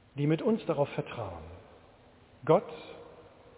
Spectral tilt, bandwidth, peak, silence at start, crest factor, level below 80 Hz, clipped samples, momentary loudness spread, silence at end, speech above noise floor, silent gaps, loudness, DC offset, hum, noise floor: -7 dB/octave; 4 kHz; -10 dBFS; 0.15 s; 22 dB; -60 dBFS; under 0.1%; 23 LU; 0.35 s; 28 dB; none; -31 LUFS; under 0.1%; none; -58 dBFS